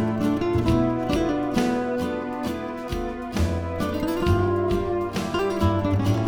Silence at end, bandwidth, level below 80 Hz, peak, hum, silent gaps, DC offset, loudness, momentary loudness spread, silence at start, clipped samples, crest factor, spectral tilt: 0 s; 19.5 kHz; -36 dBFS; -8 dBFS; none; none; under 0.1%; -24 LUFS; 7 LU; 0 s; under 0.1%; 16 dB; -7 dB/octave